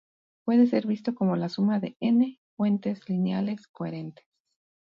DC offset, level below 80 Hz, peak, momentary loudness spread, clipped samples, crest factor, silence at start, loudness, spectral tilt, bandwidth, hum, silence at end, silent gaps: under 0.1%; -74 dBFS; -10 dBFS; 12 LU; under 0.1%; 16 dB; 0.45 s; -27 LUFS; -9 dB/octave; 7 kHz; none; 0.75 s; 2.38-2.57 s, 3.69-3.74 s